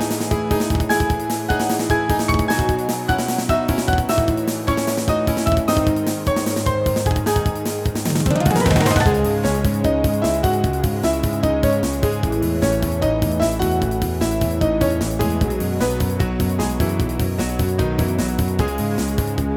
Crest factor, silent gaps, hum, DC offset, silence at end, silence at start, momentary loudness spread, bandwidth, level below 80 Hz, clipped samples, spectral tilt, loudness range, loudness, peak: 16 dB; none; none; under 0.1%; 0 s; 0 s; 4 LU; 19 kHz; -28 dBFS; under 0.1%; -6 dB/octave; 2 LU; -20 LUFS; -2 dBFS